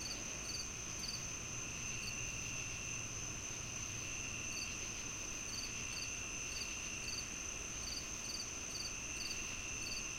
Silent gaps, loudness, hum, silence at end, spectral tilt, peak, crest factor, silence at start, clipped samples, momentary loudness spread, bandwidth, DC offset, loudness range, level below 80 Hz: none; -42 LUFS; none; 0 s; -1 dB/octave; -30 dBFS; 14 dB; 0 s; under 0.1%; 2 LU; 16.5 kHz; under 0.1%; 0 LU; -56 dBFS